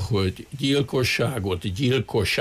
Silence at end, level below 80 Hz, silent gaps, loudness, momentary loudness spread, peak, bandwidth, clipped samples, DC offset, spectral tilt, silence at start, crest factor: 0 s; -46 dBFS; none; -24 LUFS; 6 LU; -10 dBFS; 15.5 kHz; under 0.1%; under 0.1%; -5.5 dB/octave; 0 s; 12 dB